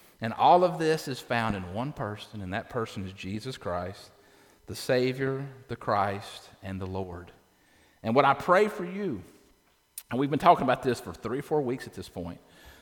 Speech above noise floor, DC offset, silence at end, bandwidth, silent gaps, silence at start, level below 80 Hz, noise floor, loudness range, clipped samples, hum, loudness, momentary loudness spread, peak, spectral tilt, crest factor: 37 dB; under 0.1%; 0.1 s; 19 kHz; none; 0.2 s; -60 dBFS; -65 dBFS; 7 LU; under 0.1%; none; -28 LUFS; 18 LU; -6 dBFS; -6 dB/octave; 24 dB